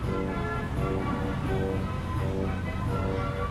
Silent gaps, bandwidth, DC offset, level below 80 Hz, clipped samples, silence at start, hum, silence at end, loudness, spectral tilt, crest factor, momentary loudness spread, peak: none; 13.5 kHz; under 0.1%; -38 dBFS; under 0.1%; 0 s; none; 0 s; -30 LUFS; -7.5 dB/octave; 12 dB; 2 LU; -16 dBFS